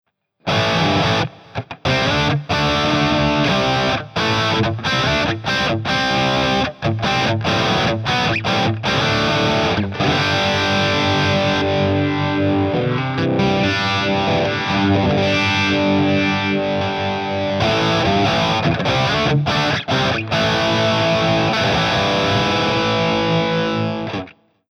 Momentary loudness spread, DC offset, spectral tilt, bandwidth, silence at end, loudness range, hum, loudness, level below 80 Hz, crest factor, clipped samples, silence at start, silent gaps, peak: 4 LU; under 0.1%; -5.5 dB/octave; 13.5 kHz; 0.4 s; 1 LU; none; -17 LUFS; -40 dBFS; 12 dB; under 0.1%; 0.45 s; none; -4 dBFS